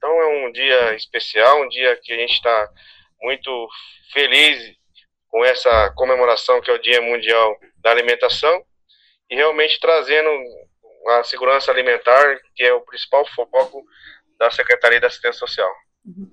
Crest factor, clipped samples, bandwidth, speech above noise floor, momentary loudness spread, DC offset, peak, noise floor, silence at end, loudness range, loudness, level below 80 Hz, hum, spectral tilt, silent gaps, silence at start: 18 dB; under 0.1%; 14 kHz; 42 dB; 11 LU; under 0.1%; 0 dBFS; -58 dBFS; 0.1 s; 2 LU; -16 LUFS; -46 dBFS; none; -2.5 dB/octave; none; 0.05 s